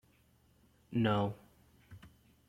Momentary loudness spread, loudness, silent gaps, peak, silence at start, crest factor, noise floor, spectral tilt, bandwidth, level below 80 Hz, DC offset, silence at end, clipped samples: 25 LU; -34 LUFS; none; -16 dBFS; 0.9 s; 22 dB; -69 dBFS; -8 dB/octave; 14.5 kHz; -66 dBFS; under 0.1%; 0.4 s; under 0.1%